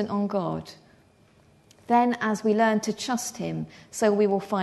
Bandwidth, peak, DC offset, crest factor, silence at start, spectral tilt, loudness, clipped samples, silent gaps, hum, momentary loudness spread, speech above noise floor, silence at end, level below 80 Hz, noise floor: 12.5 kHz; -10 dBFS; under 0.1%; 16 dB; 0 s; -5 dB/octave; -25 LUFS; under 0.1%; none; none; 12 LU; 34 dB; 0 s; -66 dBFS; -58 dBFS